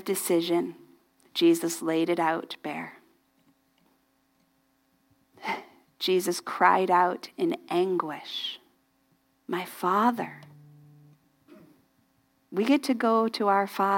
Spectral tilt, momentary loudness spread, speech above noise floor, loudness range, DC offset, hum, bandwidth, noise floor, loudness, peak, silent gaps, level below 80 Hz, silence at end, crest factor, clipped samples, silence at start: -4 dB/octave; 13 LU; 43 dB; 8 LU; under 0.1%; none; 17 kHz; -69 dBFS; -27 LUFS; -6 dBFS; none; -84 dBFS; 0 s; 22 dB; under 0.1%; 0 s